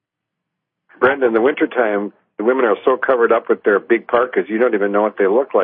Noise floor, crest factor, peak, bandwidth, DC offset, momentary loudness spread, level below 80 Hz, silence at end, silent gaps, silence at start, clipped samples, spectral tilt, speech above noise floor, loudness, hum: -80 dBFS; 14 dB; -2 dBFS; 3.8 kHz; under 0.1%; 4 LU; -64 dBFS; 0 s; none; 1 s; under 0.1%; -10.5 dB/octave; 64 dB; -16 LUFS; none